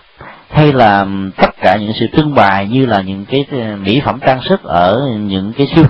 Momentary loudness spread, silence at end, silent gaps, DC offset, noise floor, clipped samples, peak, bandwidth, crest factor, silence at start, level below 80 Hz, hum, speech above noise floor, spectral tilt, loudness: 7 LU; 0 s; none; under 0.1%; -36 dBFS; 0.2%; 0 dBFS; 5.8 kHz; 12 dB; 0.2 s; -38 dBFS; none; 25 dB; -9 dB/octave; -12 LUFS